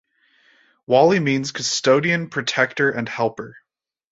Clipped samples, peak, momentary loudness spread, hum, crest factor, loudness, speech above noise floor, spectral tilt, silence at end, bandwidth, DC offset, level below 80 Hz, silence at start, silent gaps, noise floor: under 0.1%; -2 dBFS; 9 LU; none; 20 dB; -19 LUFS; 40 dB; -4 dB/octave; 0.6 s; 8 kHz; under 0.1%; -64 dBFS; 0.9 s; none; -59 dBFS